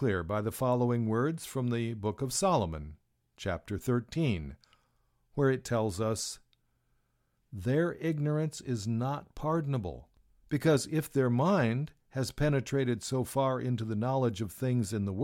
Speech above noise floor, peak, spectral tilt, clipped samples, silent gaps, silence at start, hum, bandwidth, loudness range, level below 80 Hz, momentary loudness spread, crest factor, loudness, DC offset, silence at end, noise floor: 45 dB; -14 dBFS; -6 dB/octave; under 0.1%; none; 0 s; none; 16.5 kHz; 4 LU; -54 dBFS; 9 LU; 18 dB; -31 LUFS; under 0.1%; 0 s; -75 dBFS